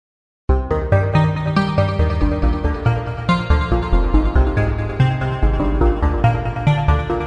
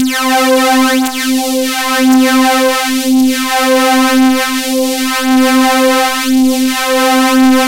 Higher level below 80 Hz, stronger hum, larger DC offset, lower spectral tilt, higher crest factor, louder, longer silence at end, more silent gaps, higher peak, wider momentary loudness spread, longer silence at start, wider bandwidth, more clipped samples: first, -20 dBFS vs -50 dBFS; neither; second, under 0.1% vs 1%; first, -8.5 dB/octave vs -1.5 dB/octave; about the same, 14 dB vs 10 dB; second, -18 LUFS vs -10 LUFS; about the same, 0 s vs 0 s; neither; about the same, -2 dBFS vs 0 dBFS; about the same, 3 LU vs 5 LU; first, 0.5 s vs 0 s; second, 7.8 kHz vs 16 kHz; neither